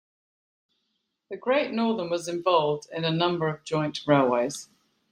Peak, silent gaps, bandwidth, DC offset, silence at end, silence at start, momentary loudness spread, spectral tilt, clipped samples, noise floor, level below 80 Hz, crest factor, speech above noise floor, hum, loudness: -6 dBFS; none; 16 kHz; under 0.1%; 0.5 s; 1.3 s; 8 LU; -5.5 dB/octave; under 0.1%; -78 dBFS; -68 dBFS; 22 dB; 53 dB; none; -26 LUFS